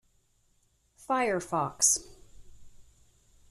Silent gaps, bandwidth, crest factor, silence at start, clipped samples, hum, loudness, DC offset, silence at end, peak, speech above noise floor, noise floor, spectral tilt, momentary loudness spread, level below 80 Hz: none; 14 kHz; 24 dB; 1 s; under 0.1%; none; -27 LUFS; under 0.1%; 0.7 s; -10 dBFS; 41 dB; -70 dBFS; -2 dB/octave; 8 LU; -60 dBFS